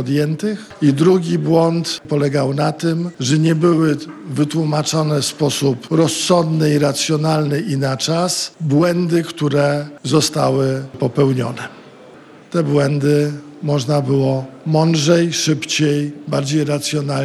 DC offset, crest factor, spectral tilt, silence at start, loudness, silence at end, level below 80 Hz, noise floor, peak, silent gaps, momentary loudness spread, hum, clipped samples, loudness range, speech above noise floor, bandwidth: under 0.1%; 16 dB; -5.5 dB/octave; 0 s; -17 LUFS; 0 s; -58 dBFS; -41 dBFS; 0 dBFS; none; 7 LU; none; under 0.1%; 2 LU; 25 dB; 13.5 kHz